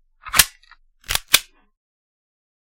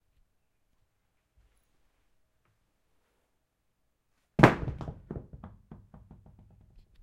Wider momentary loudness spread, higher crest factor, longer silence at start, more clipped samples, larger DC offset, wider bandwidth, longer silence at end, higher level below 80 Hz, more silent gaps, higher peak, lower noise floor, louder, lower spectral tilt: second, 9 LU vs 26 LU; second, 24 dB vs 34 dB; second, 0.25 s vs 4.4 s; neither; neither; about the same, 17 kHz vs 15.5 kHz; about the same, 1.3 s vs 1.3 s; first, -44 dBFS vs -52 dBFS; neither; about the same, 0 dBFS vs 0 dBFS; second, -53 dBFS vs -78 dBFS; first, -18 LUFS vs -25 LUFS; second, 1 dB/octave vs -7 dB/octave